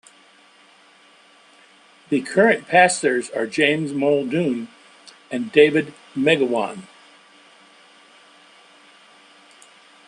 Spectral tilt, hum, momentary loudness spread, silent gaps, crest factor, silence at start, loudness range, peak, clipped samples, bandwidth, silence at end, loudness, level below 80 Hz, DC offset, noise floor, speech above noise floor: -4.5 dB/octave; none; 14 LU; none; 20 dB; 2.1 s; 7 LU; -2 dBFS; under 0.1%; 11.5 kHz; 3.25 s; -19 LUFS; -68 dBFS; under 0.1%; -52 dBFS; 33 dB